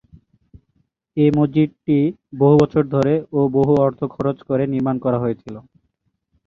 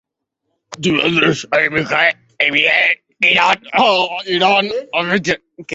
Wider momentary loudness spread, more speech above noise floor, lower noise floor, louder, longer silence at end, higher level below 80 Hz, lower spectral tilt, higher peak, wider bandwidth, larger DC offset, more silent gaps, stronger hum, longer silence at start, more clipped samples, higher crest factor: about the same, 9 LU vs 7 LU; second, 53 dB vs 59 dB; second, -70 dBFS vs -74 dBFS; second, -18 LUFS vs -14 LUFS; first, 0.9 s vs 0 s; about the same, -52 dBFS vs -56 dBFS; first, -9.5 dB/octave vs -4 dB/octave; about the same, -2 dBFS vs 0 dBFS; second, 7.2 kHz vs 8 kHz; neither; neither; neither; first, 1.15 s vs 0.7 s; neither; about the same, 18 dB vs 16 dB